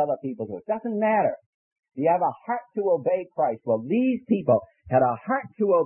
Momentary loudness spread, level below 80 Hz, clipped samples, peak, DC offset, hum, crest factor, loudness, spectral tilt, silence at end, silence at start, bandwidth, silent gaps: 8 LU; -66 dBFS; under 0.1%; -8 dBFS; under 0.1%; none; 16 dB; -25 LUFS; -12 dB/octave; 0 s; 0 s; 3.3 kHz; 1.46-1.76 s